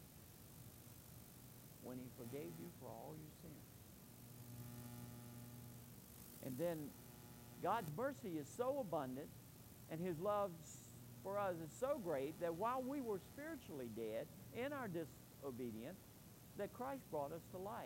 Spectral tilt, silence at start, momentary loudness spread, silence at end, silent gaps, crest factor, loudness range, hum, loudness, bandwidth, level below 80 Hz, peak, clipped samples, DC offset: -6 dB/octave; 0 s; 16 LU; 0 s; none; 20 dB; 10 LU; none; -48 LUFS; 16 kHz; -74 dBFS; -28 dBFS; under 0.1%; under 0.1%